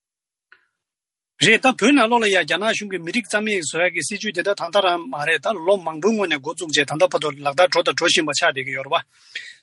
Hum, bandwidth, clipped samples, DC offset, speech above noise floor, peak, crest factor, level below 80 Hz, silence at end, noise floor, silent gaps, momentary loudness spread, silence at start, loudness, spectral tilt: none; 11.5 kHz; under 0.1%; under 0.1%; 69 dB; -2 dBFS; 18 dB; -68 dBFS; 0.1 s; -89 dBFS; none; 9 LU; 1.4 s; -19 LUFS; -3 dB/octave